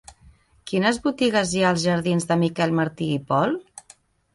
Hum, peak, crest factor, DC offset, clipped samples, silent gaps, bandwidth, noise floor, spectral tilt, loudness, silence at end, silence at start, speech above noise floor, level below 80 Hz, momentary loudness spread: none; -4 dBFS; 18 dB; under 0.1%; under 0.1%; none; 11.5 kHz; -54 dBFS; -5.5 dB/octave; -22 LUFS; 0.7 s; 0.1 s; 33 dB; -56 dBFS; 6 LU